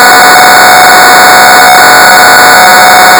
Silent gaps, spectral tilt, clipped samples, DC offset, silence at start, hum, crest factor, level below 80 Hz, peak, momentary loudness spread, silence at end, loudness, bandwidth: none; -0.5 dB/octave; 50%; 0.4%; 0 s; none; 0 dB; -38 dBFS; 0 dBFS; 0 LU; 0 s; 1 LUFS; over 20 kHz